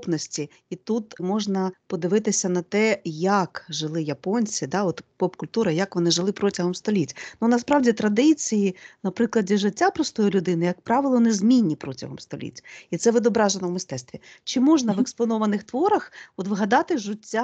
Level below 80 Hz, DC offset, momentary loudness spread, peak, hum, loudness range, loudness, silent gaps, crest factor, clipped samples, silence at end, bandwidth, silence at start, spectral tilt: -66 dBFS; under 0.1%; 13 LU; -6 dBFS; none; 3 LU; -23 LUFS; none; 18 dB; under 0.1%; 0 s; 8.8 kHz; 0 s; -5 dB/octave